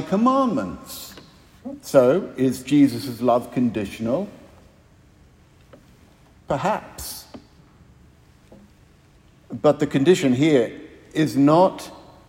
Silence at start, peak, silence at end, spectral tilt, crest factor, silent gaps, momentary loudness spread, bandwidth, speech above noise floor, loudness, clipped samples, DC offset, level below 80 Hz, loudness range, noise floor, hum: 0 s; -2 dBFS; 0.3 s; -6.5 dB/octave; 20 dB; none; 19 LU; 16.5 kHz; 33 dB; -20 LUFS; under 0.1%; under 0.1%; -56 dBFS; 12 LU; -53 dBFS; none